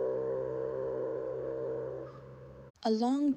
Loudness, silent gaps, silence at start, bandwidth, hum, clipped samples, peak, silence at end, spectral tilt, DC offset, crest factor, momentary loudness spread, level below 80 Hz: -35 LUFS; 2.70-2.74 s; 0 s; 8.8 kHz; none; under 0.1%; -18 dBFS; 0 s; -7 dB/octave; under 0.1%; 16 dB; 20 LU; -64 dBFS